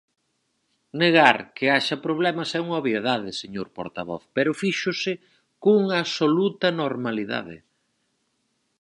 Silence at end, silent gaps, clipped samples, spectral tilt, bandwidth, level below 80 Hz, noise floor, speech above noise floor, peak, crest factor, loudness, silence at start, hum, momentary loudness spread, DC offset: 1.25 s; none; under 0.1%; -5 dB/octave; 11.5 kHz; -68 dBFS; -73 dBFS; 50 dB; 0 dBFS; 24 dB; -23 LUFS; 0.95 s; none; 14 LU; under 0.1%